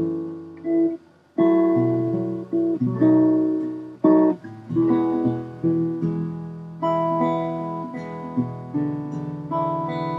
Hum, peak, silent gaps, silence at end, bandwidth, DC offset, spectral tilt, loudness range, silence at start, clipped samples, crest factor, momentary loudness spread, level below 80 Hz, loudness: none; -6 dBFS; none; 0 s; 4.5 kHz; under 0.1%; -10.5 dB/octave; 6 LU; 0 s; under 0.1%; 16 dB; 13 LU; -62 dBFS; -23 LUFS